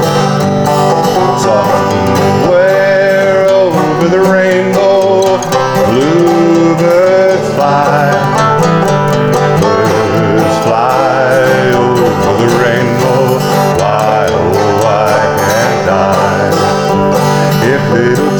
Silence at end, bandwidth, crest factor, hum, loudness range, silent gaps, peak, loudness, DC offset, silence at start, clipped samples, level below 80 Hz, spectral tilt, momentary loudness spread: 0 s; over 20 kHz; 8 dB; none; 1 LU; none; 0 dBFS; -9 LUFS; under 0.1%; 0 s; under 0.1%; -40 dBFS; -6 dB/octave; 2 LU